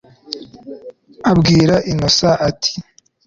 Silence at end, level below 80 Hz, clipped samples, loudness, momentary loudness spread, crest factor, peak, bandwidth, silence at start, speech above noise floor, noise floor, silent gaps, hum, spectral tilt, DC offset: 0.45 s; -40 dBFS; under 0.1%; -14 LUFS; 23 LU; 14 dB; -2 dBFS; 7.6 kHz; 0.3 s; 24 dB; -37 dBFS; none; none; -5 dB/octave; under 0.1%